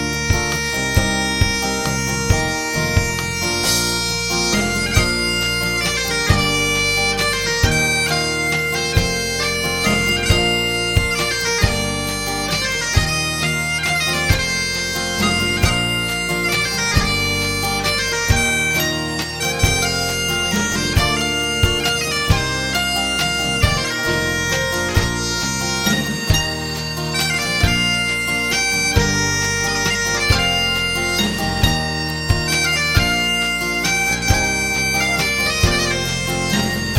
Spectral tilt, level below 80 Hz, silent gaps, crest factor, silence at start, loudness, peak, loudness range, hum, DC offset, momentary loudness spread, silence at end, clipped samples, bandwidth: -3 dB/octave; -30 dBFS; none; 18 dB; 0 s; -17 LUFS; -2 dBFS; 2 LU; none; under 0.1%; 4 LU; 0 s; under 0.1%; 17 kHz